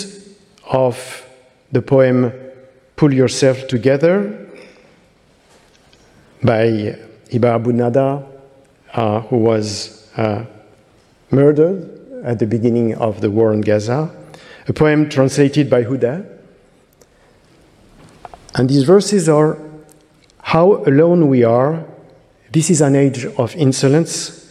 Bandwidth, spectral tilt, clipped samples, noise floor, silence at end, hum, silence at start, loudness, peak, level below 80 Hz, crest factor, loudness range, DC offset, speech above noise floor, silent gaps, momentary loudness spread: 13.5 kHz; -6.5 dB/octave; under 0.1%; -52 dBFS; 0.15 s; none; 0 s; -15 LUFS; 0 dBFS; -54 dBFS; 16 dB; 6 LU; under 0.1%; 38 dB; none; 15 LU